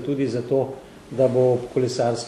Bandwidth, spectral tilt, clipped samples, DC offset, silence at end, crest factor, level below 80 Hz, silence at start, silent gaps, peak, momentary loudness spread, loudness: 12 kHz; -6.5 dB/octave; under 0.1%; under 0.1%; 0 s; 14 dB; -58 dBFS; 0 s; none; -8 dBFS; 13 LU; -22 LUFS